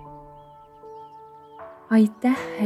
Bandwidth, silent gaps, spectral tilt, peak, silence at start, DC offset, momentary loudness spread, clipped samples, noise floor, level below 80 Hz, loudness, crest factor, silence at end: 12 kHz; none; -7 dB/octave; -8 dBFS; 0 s; under 0.1%; 25 LU; under 0.1%; -47 dBFS; -62 dBFS; -21 LUFS; 18 dB; 0 s